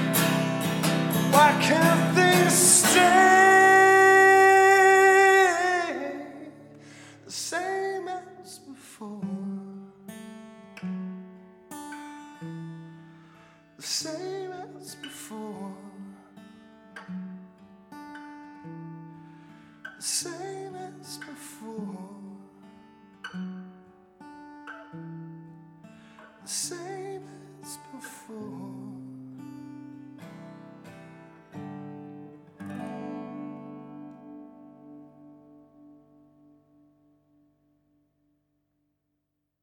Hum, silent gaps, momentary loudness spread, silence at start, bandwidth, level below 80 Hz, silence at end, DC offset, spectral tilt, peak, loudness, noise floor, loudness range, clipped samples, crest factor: none; none; 28 LU; 0 s; 19 kHz; -74 dBFS; 5.2 s; under 0.1%; -3.5 dB/octave; -4 dBFS; -20 LUFS; -80 dBFS; 27 LU; under 0.1%; 22 dB